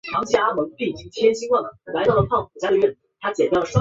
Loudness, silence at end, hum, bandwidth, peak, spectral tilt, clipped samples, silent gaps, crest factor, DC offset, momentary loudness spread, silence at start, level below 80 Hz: -21 LUFS; 0 s; none; 8 kHz; -2 dBFS; -6 dB/octave; under 0.1%; none; 18 dB; under 0.1%; 9 LU; 0.05 s; -48 dBFS